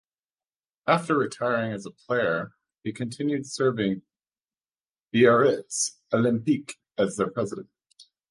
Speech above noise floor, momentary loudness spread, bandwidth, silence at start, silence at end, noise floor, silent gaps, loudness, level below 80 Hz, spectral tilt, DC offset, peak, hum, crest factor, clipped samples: over 65 dB; 14 LU; 11.5 kHz; 0.85 s; 0.3 s; under -90 dBFS; 4.90-4.94 s, 5.02-5.06 s; -25 LUFS; -66 dBFS; -5 dB/octave; under 0.1%; -6 dBFS; none; 20 dB; under 0.1%